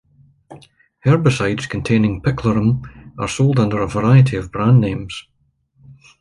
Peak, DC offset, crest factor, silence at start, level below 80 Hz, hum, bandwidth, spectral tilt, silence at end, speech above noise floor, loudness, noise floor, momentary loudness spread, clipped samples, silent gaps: -2 dBFS; under 0.1%; 16 dB; 0.5 s; -42 dBFS; none; 11.5 kHz; -7 dB/octave; 0.3 s; 43 dB; -17 LUFS; -59 dBFS; 13 LU; under 0.1%; none